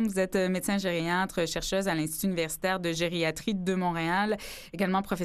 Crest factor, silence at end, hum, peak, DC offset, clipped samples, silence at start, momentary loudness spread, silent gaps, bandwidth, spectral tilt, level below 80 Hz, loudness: 16 dB; 0 s; none; -14 dBFS; under 0.1%; under 0.1%; 0 s; 3 LU; none; 14.5 kHz; -4.5 dB/octave; -52 dBFS; -29 LUFS